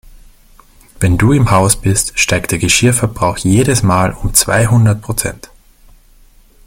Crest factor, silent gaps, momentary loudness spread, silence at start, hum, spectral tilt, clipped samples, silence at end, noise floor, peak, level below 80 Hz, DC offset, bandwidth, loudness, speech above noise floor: 14 dB; none; 6 LU; 1 s; none; -4.5 dB/octave; under 0.1%; 1.3 s; -44 dBFS; 0 dBFS; -30 dBFS; under 0.1%; 17 kHz; -12 LUFS; 33 dB